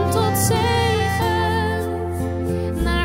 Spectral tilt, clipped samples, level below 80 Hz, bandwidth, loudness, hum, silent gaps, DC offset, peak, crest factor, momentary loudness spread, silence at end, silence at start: -5 dB/octave; under 0.1%; -32 dBFS; 16 kHz; -20 LUFS; none; none; under 0.1%; -6 dBFS; 14 dB; 6 LU; 0 s; 0 s